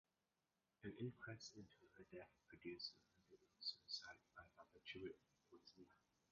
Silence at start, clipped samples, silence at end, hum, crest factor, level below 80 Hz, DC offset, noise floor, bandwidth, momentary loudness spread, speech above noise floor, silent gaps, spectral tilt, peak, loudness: 0.8 s; under 0.1%; 0.35 s; none; 22 dB; -84 dBFS; under 0.1%; under -90 dBFS; 7 kHz; 16 LU; over 32 dB; none; -3 dB/octave; -38 dBFS; -56 LUFS